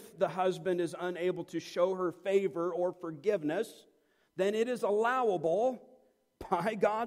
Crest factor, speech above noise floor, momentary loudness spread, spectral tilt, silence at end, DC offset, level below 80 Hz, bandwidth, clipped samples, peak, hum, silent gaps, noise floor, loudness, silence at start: 18 dB; 34 dB; 7 LU; -6 dB/octave; 0 s; under 0.1%; -72 dBFS; 15.5 kHz; under 0.1%; -14 dBFS; none; none; -65 dBFS; -32 LUFS; 0 s